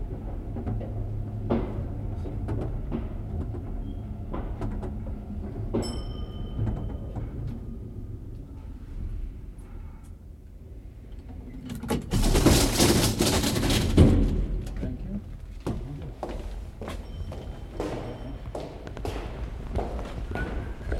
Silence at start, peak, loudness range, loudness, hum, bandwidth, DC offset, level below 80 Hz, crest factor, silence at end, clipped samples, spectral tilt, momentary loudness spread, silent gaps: 0 s; -6 dBFS; 16 LU; -29 LUFS; none; 16.5 kHz; under 0.1%; -34 dBFS; 24 dB; 0 s; under 0.1%; -5 dB/octave; 21 LU; none